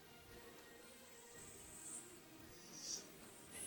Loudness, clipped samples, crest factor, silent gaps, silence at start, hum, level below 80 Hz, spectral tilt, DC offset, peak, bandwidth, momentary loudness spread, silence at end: -54 LUFS; under 0.1%; 22 dB; none; 0 s; none; -76 dBFS; -1.5 dB/octave; under 0.1%; -34 dBFS; 18 kHz; 11 LU; 0 s